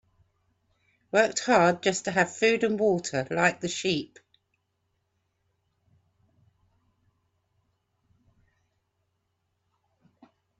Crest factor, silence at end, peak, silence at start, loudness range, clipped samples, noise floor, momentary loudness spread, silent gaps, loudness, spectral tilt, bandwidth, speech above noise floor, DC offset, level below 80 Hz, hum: 22 dB; 6.55 s; -8 dBFS; 1.15 s; 12 LU; under 0.1%; -77 dBFS; 8 LU; none; -25 LUFS; -4 dB/octave; 8.4 kHz; 52 dB; under 0.1%; -70 dBFS; none